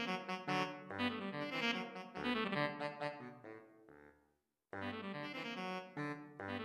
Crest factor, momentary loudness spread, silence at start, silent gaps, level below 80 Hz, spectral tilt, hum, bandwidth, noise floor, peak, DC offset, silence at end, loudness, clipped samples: 22 dB; 15 LU; 0 s; none; -78 dBFS; -5 dB/octave; none; 13 kHz; -81 dBFS; -22 dBFS; under 0.1%; 0 s; -42 LUFS; under 0.1%